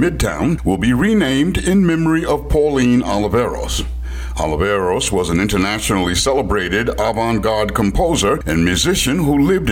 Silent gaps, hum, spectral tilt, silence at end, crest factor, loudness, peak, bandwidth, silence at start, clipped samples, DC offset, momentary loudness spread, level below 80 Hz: none; none; -5 dB/octave; 0 s; 10 dB; -16 LUFS; -4 dBFS; 17 kHz; 0 s; under 0.1%; under 0.1%; 4 LU; -28 dBFS